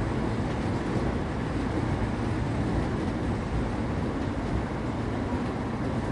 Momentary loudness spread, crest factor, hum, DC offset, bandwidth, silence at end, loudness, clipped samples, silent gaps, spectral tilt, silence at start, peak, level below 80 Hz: 2 LU; 14 dB; none; under 0.1%; 11.5 kHz; 0 s; -30 LUFS; under 0.1%; none; -7.5 dB/octave; 0 s; -14 dBFS; -36 dBFS